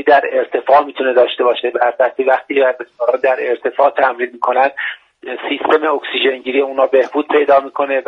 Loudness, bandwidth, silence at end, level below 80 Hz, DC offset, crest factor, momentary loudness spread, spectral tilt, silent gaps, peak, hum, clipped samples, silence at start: -15 LUFS; 6.2 kHz; 0.05 s; -66 dBFS; under 0.1%; 14 dB; 7 LU; -4.5 dB/octave; none; 0 dBFS; none; under 0.1%; 0 s